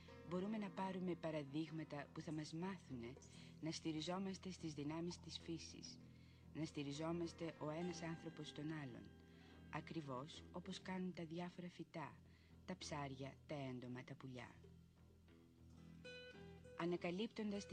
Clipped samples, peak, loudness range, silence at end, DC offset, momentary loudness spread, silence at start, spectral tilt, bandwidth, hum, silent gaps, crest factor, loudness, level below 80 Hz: under 0.1%; -32 dBFS; 4 LU; 0 s; under 0.1%; 17 LU; 0 s; -5.5 dB/octave; 10 kHz; none; none; 18 dB; -50 LUFS; -74 dBFS